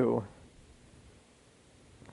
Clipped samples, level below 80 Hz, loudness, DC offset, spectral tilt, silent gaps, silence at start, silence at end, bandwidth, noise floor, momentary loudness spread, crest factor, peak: under 0.1%; -64 dBFS; -34 LUFS; under 0.1%; -8 dB/octave; none; 0 s; 1.85 s; 11.5 kHz; -61 dBFS; 26 LU; 22 dB; -16 dBFS